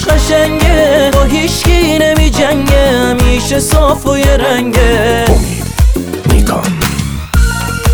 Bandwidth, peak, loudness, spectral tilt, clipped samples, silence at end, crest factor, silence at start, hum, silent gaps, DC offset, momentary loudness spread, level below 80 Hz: over 20 kHz; 0 dBFS; -10 LUFS; -5 dB/octave; under 0.1%; 0 s; 10 dB; 0 s; none; none; under 0.1%; 5 LU; -14 dBFS